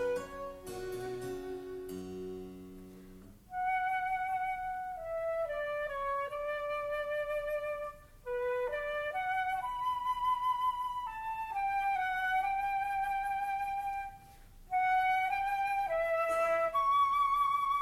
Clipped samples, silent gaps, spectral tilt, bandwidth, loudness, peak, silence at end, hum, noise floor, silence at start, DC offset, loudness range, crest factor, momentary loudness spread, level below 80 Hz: under 0.1%; none; -4 dB/octave; 16 kHz; -34 LUFS; -22 dBFS; 0 s; none; -55 dBFS; 0 s; under 0.1%; 6 LU; 12 dB; 14 LU; -58 dBFS